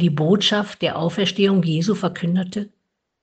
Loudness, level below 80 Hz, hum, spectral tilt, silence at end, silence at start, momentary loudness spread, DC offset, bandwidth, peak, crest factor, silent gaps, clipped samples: -20 LUFS; -62 dBFS; none; -6 dB/octave; 0.55 s; 0 s; 8 LU; under 0.1%; 8.6 kHz; -4 dBFS; 16 dB; none; under 0.1%